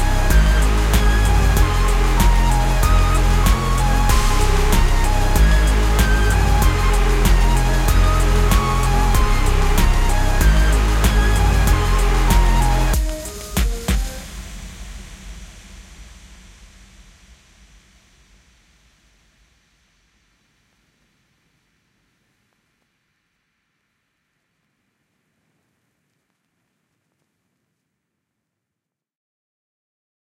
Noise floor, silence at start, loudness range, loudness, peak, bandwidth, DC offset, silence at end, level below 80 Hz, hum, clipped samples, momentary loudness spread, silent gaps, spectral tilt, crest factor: -83 dBFS; 0 s; 11 LU; -18 LUFS; -2 dBFS; 16 kHz; under 0.1%; 14.3 s; -18 dBFS; none; under 0.1%; 9 LU; none; -5 dB/octave; 16 dB